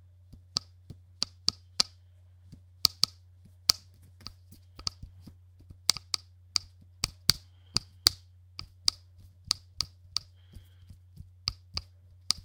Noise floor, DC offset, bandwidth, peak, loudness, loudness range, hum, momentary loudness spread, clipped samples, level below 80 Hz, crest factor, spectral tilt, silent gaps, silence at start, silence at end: -57 dBFS; under 0.1%; 18 kHz; 0 dBFS; -30 LUFS; 5 LU; none; 20 LU; under 0.1%; -56 dBFS; 36 dB; -0.5 dB/octave; none; 1.2 s; 0.1 s